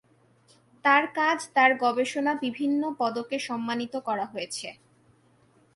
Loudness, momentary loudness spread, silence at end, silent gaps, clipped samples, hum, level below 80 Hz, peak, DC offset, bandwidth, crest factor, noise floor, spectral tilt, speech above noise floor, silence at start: -26 LUFS; 11 LU; 1.05 s; none; under 0.1%; none; -76 dBFS; -8 dBFS; under 0.1%; 11.5 kHz; 20 dB; -62 dBFS; -3 dB/octave; 36 dB; 0.85 s